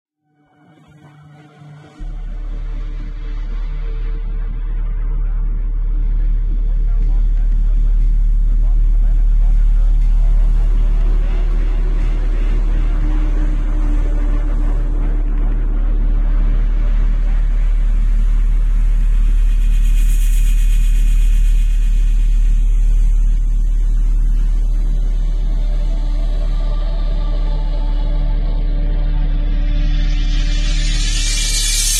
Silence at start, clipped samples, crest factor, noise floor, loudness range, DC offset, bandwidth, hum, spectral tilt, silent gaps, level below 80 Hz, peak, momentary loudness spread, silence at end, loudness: 1.65 s; under 0.1%; 10 dB; -58 dBFS; 7 LU; under 0.1%; 12 kHz; none; -4 dB/octave; none; -14 dBFS; -2 dBFS; 8 LU; 0 s; -20 LUFS